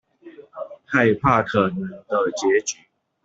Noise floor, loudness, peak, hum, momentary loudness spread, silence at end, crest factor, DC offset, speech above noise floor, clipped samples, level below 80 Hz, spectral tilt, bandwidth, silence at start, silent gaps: -45 dBFS; -21 LUFS; -2 dBFS; none; 19 LU; 0.5 s; 20 dB; under 0.1%; 25 dB; under 0.1%; -52 dBFS; -5 dB/octave; 8 kHz; 0.25 s; none